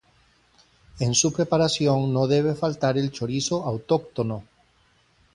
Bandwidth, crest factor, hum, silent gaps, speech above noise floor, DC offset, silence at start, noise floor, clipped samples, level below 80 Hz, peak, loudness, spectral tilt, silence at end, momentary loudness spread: 11 kHz; 18 dB; none; none; 39 dB; under 0.1%; 0.95 s; -62 dBFS; under 0.1%; -56 dBFS; -8 dBFS; -23 LUFS; -5 dB/octave; 0.9 s; 8 LU